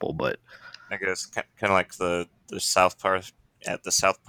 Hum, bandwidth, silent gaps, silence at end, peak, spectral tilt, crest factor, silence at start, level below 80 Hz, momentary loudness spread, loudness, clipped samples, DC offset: none; 19.5 kHz; none; 0.15 s; -6 dBFS; -2.5 dB/octave; 22 dB; 0 s; -58 dBFS; 16 LU; -26 LUFS; under 0.1%; under 0.1%